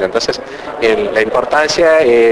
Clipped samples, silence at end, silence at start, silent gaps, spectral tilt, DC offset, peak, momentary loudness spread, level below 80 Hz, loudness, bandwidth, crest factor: under 0.1%; 0 s; 0 s; none; -3.5 dB/octave; under 0.1%; 0 dBFS; 10 LU; -44 dBFS; -12 LUFS; 11 kHz; 12 dB